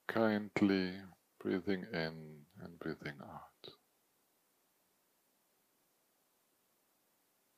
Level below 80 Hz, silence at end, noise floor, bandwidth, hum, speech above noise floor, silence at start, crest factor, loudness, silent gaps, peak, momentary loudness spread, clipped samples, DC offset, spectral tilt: -78 dBFS; 3.85 s; -77 dBFS; 15.5 kHz; none; 40 dB; 0.1 s; 24 dB; -38 LUFS; none; -18 dBFS; 22 LU; under 0.1%; under 0.1%; -7 dB/octave